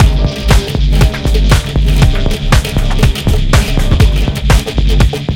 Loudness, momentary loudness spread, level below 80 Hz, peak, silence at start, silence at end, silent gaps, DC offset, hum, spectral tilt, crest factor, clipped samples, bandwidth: -12 LUFS; 3 LU; -12 dBFS; 0 dBFS; 0 s; 0 s; none; under 0.1%; none; -5.5 dB/octave; 10 dB; 0.4%; 16.5 kHz